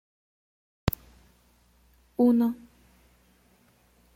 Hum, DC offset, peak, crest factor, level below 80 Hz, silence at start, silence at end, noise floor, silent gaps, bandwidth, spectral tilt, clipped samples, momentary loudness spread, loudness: none; under 0.1%; -6 dBFS; 26 dB; -52 dBFS; 0.85 s; 1.6 s; -63 dBFS; none; 16.5 kHz; -7.5 dB/octave; under 0.1%; 18 LU; -27 LUFS